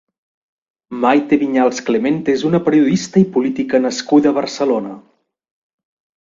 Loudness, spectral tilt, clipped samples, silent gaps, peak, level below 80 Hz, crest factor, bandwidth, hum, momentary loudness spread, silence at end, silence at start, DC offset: -15 LUFS; -6 dB/octave; under 0.1%; none; 0 dBFS; -58 dBFS; 16 dB; 7.6 kHz; none; 5 LU; 1.2 s; 0.9 s; under 0.1%